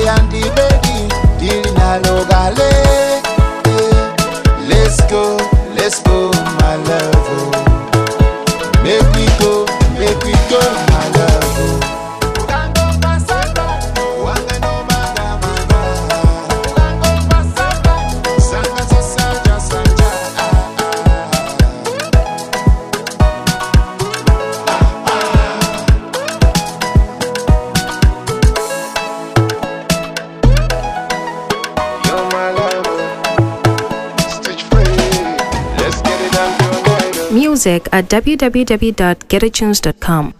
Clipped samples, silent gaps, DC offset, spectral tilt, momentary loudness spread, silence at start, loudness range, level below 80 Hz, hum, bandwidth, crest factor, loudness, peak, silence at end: under 0.1%; none; 0.2%; -5 dB/octave; 6 LU; 0 s; 4 LU; -16 dBFS; none; 15.5 kHz; 12 dB; -14 LUFS; 0 dBFS; 0.05 s